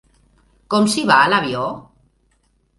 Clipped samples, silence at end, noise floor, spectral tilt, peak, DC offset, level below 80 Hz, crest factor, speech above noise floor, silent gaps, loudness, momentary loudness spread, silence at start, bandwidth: under 0.1%; 1 s; -62 dBFS; -4 dB/octave; 0 dBFS; under 0.1%; -56 dBFS; 20 dB; 46 dB; none; -16 LUFS; 13 LU; 0.7 s; 11.5 kHz